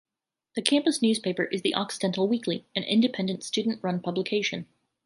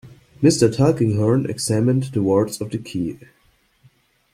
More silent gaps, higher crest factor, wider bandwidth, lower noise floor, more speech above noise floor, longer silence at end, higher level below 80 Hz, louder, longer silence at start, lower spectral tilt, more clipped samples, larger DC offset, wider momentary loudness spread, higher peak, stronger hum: neither; first, 26 dB vs 18 dB; second, 11.5 kHz vs 15.5 kHz; first, -69 dBFS vs -60 dBFS; about the same, 43 dB vs 42 dB; second, 0.4 s vs 1.2 s; second, -74 dBFS vs -54 dBFS; second, -27 LUFS vs -19 LUFS; first, 0.55 s vs 0.05 s; second, -4.5 dB/octave vs -6.5 dB/octave; neither; neither; second, 7 LU vs 11 LU; about the same, -2 dBFS vs -2 dBFS; neither